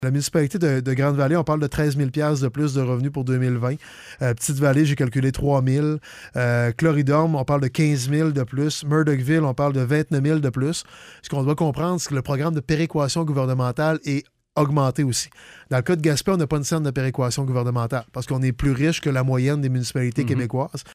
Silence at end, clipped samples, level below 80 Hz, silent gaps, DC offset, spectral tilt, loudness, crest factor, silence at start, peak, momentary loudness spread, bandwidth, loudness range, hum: 0 s; under 0.1%; -46 dBFS; none; under 0.1%; -6 dB/octave; -22 LUFS; 14 dB; 0 s; -6 dBFS; 6 LU; 15.5 kHz; 2 LU; none